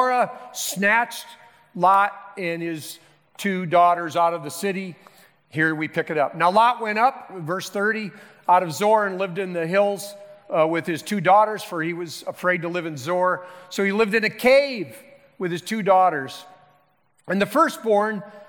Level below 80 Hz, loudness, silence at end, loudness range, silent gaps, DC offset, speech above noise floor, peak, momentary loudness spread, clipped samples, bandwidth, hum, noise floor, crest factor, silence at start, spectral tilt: -70 dBFS; -22 LUFS; 0.05 s; 2 LU; none; under 0.1%; 42 dB; -6 dBFS; 14 LU; under 0.1%; 19 kHz; none; -64 dBFS; 16 dB; 0 s; -4.5 dB/octave